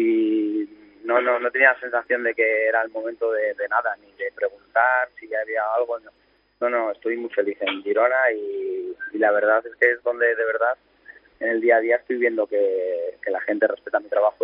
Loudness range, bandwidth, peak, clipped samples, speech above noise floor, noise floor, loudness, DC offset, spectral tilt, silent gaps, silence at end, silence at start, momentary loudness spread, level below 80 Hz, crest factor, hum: 3 LU; 5.2 kHz; -2 dBFS; under 0.1%; 27 dB; -49 dBFS; -22 LUFS; under 0.1%; -0.5 dB/octave; none; 0 s; 0 s; 10 LU; -72 dBFS; 20 dB; 50 Hz at -75 dBFS